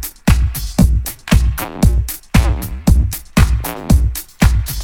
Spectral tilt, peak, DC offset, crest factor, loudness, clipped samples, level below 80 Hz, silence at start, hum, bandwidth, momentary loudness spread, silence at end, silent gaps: -5.5 dB/octave; 0 dBFS; under 0.1%; 14 dB; -16 LUFS; under 0.1%; -16 dBFS; 0 s; none; 18.5 kHz; 5 LU; 0 s; none